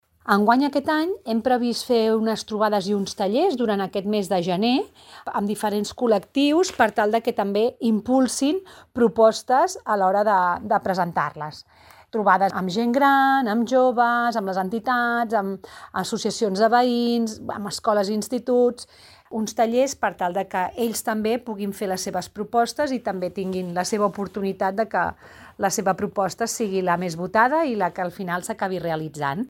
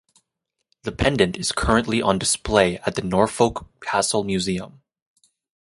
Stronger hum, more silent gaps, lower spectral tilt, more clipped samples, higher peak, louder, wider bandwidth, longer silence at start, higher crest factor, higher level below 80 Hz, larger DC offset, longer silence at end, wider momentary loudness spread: neither; neither; about the same, -4.5 dB/octave vs -4 dB/octave; neither; about the same, -4 dBFS vs -2 dBFS; about the same, -22 LUFS vs -21 LUFS; first, 17 kHz vs 11.5 kHz; second, 0.25 s vs 0.85 s; about the same, 18 dB vs 22 dB; second, -60 dBFS vs -40 dBFS; neither; second, 0 s vs 0.95 s; about the same, 9 LU vs 11 LU